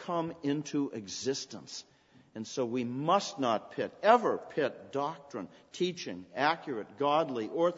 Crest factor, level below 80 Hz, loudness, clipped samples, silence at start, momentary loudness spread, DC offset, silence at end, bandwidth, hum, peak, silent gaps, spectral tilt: 24 dB; -78 dBFS; -32 LUFS; under 0.1%; 0 s; 15 LU; under 0.1%; 0 s; 8 kHz; none; -8 dBFS; none; -4.5 dB/octave